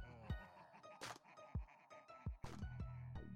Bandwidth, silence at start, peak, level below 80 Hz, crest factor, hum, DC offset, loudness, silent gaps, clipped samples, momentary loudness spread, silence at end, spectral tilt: 15.5 kHz; 0 s; -36 dBFS; -58 dBFS; 16 dB; none; under 0.1%; -54 LUFS; none; under 0.1%; 10 LU; 0 s; -5.5 dB/octave